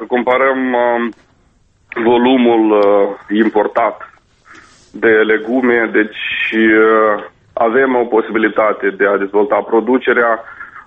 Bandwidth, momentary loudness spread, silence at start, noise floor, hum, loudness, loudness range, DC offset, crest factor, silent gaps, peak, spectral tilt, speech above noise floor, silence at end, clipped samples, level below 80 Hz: 5.6 kHz; 7 LU; 0 s; -53 dBFS; none; -13 LUFS; 2 LU; under 0.1%; 14 dB; none; 0 dBFS; -7 dB/octave; 41 dB; 0.05 s; under 0.1%; -56 dBFS